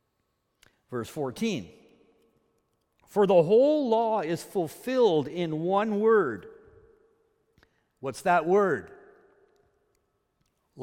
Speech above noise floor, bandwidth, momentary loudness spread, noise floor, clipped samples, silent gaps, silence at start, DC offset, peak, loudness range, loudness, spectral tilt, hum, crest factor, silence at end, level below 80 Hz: 52 dB; 16.5 kHz; 15 LU; -76 dBFS; under 0.1%; none; 0.9 s; under 0.1%; -8 dBFS; 6 LU; -26 LUFS; -6 dB/octave; none; 20 dB; 0 s; -70 dBFS